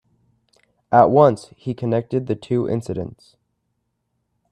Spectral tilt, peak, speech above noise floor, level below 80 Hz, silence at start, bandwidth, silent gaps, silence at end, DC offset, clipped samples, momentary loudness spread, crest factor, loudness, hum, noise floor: -8.5 dB/octave; 0 dBFS; 55 dB; -58 dBFS; 0.9 s; 10.5 kHz; none; 1.4 s; under 0.1%; under 0.1%; 16 LU; 20 dB; -19 LUFS; none; -73 dBFS